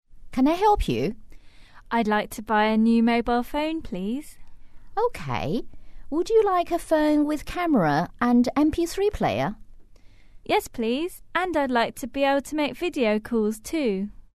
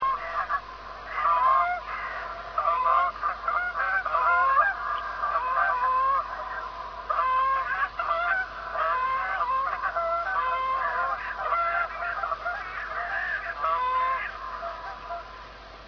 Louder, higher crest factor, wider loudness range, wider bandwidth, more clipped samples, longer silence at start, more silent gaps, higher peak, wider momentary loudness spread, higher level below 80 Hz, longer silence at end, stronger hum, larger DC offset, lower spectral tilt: first, -24 LUFS vs -27 LUFS; about the same, 16 dB vs 16 dB; about the same, 4 LU vs 4 LU; first, 13.5 kHz vs 5.4 kHz; neither; about the same, 0.1 s vs 0 s; neither; about the same, -10 dBFS vs -12 dBFS; about the same, 10 LU vs 12 LU; first, -42 dBFS vs -52 dBFS; first, 0.25 s vs 0 s; neither; first, 0.3% vs under 0.1%; first, -5.5 dB/octave vs -3.5 dB/octave